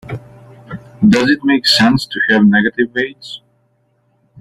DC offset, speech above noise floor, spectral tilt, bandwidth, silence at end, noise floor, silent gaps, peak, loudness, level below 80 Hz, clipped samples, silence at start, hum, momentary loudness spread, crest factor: under 0.1%; 47 dB; -5 dB/octave; 13.5 kHz; 1.05 s; -60 dBFS; none; 0 dBFS; -12 LUFS; -48 dBFS; under 0.1%; 0.05 s; none; 22 LU; 16 dB